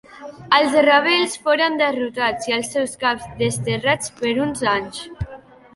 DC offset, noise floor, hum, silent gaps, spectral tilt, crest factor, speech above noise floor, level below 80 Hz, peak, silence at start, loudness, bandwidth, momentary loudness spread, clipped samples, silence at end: under 0.1%; -42 dBFS; none; none; -3.5 dB/octave; 18 dB; 23 dB; -48 dBFS; -2 dBFS; 0.1 s; -19 LUFS; 11.5 kHz; 17 LU; under 0.1%; 0.4 s